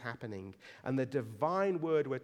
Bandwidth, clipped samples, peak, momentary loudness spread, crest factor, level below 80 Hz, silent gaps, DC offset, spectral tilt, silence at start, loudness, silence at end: 13 kHz; under 0.1%; -18 dBFS; 13 LU; 16 dB; -78 dBFS; none; under 0.1%; -8 dB/octave; 0 s; -35 LUFS; 0 s